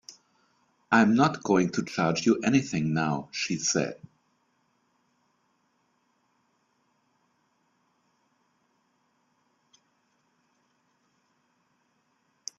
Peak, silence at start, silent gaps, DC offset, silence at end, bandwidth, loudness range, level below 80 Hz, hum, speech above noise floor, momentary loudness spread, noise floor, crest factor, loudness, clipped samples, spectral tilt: -6 dBFS; 0.1 s; none; under 0.1%; 8.65 s; 7.6 kHz; 9 LU; -68 dBFS; none; 47 dB; 8 LU; -72 dBFS; 24 dB; -25 LUFS; under 0.1%; -4.5 dB/octave